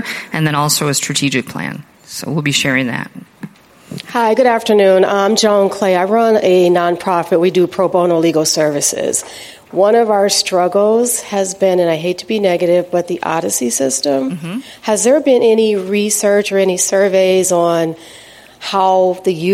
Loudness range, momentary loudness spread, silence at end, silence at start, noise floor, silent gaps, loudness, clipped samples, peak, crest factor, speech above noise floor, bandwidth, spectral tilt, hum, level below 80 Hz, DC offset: 4 LU; 12 LU; 0 s; 0 s; -34 dBFS; none; -13 LUFS; under 0.1%; 0 dBFS; 14 dB; 21 dB; 16.5 kHz; -4 dB/octave; none; -60 dBFS; under 0.1%